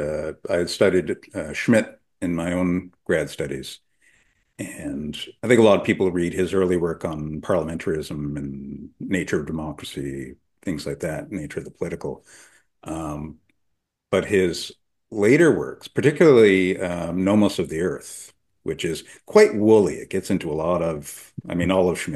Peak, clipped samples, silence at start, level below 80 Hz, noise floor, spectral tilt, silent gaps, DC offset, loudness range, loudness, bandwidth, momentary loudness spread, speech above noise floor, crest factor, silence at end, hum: -2 dBFS; under 0.1%; 0 s; -50 dBFS; -75 dBFS; -6 dB/octave; none; under 0.1%; 12 LU; -22 LUFS; 12.5 kHz; 18 LU; 53 dB; 20 dB; 0 s; none